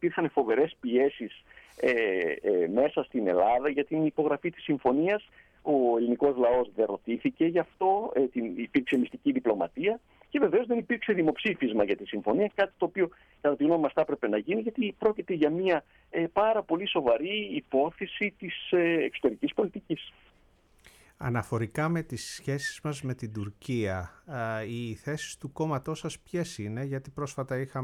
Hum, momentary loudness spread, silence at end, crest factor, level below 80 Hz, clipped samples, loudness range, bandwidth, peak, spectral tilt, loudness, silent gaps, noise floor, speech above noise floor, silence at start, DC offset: none; 10 LU; 0 s; 16 dB; -62 dBFS; under 0.1%; 7 LU; 13.5 kHz; -14 dBFS; -6 dB/octave; -29 LUFS; none; -63 dBFS; 34 dB; 0 s; under 0.1%